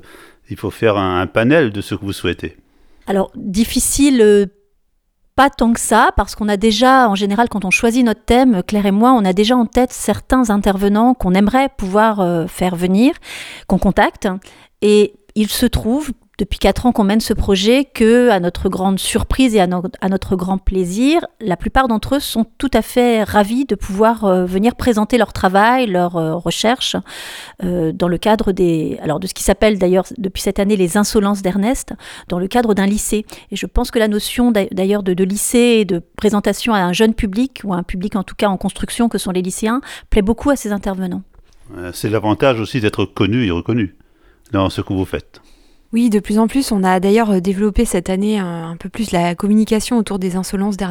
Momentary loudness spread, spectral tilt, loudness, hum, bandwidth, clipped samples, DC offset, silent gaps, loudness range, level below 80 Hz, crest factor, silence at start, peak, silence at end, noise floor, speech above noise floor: 10 LU; -5 dB/octave; -16 LUFS; none; 18.5 kHz; under 0.1%; under 0.1%; none; 5 LU; -32 dBFS; 14 dB; 0.5 s; 0 dBFS; 0 s; -61 dBFS; 46 dB